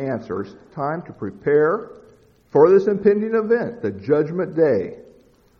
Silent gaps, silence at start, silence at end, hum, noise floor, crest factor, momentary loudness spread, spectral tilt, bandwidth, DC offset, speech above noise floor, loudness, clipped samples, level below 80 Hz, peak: none; 0 s; 0.6 s; none; -53 dBFS; 18 dB; 15 LU; -9.5 dB/octave; 6.2 kHz; under 0.1%; 34 dB; -20 LUFS; under 0.1%; -60 dBFS; -2 dBFS